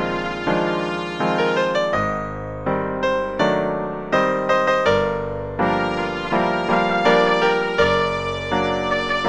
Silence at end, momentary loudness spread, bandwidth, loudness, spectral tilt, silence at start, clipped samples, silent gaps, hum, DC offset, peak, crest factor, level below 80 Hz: 0 s; 7 LU; 10 kHz; -20 LUFS; -5.5 dB/octave; 0 s; under 0.1%; none; none; under 0.1%; -4 dBFS; 16 dB; -44 dBFS